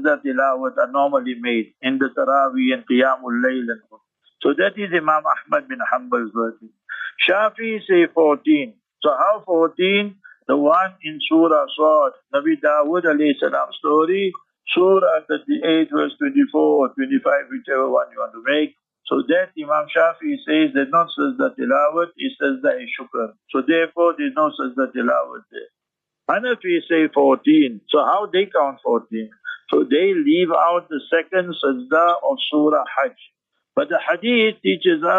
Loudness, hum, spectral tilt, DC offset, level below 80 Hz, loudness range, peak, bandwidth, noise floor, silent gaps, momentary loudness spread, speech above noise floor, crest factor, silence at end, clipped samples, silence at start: -19 LUFS; none; -7 dB/octave; under 0.1%; -78 dBFS; 3 LU; -4 dBFS; 4 kHz; -83 dBFS; none; 9 LU; 65 dB; 14 dB; 0 s; under 0.1%; 0 s